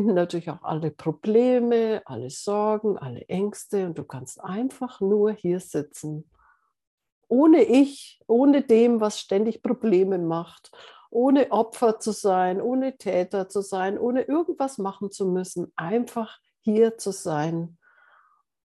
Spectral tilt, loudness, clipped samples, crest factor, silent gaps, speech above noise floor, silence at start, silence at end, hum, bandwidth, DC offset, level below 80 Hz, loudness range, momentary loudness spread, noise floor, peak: -6.5 dB/octave; -24 LUFS; under 0.1%; 16 dB; 6.87-6.98 s, 7.12-7.21 s; 40 dB; 0 s; 1.05 s; none; 12.5 kHz; under 0.1%; -74 dBFS; 7 LU; 13 LU; -63 dBFS; -8 dBFS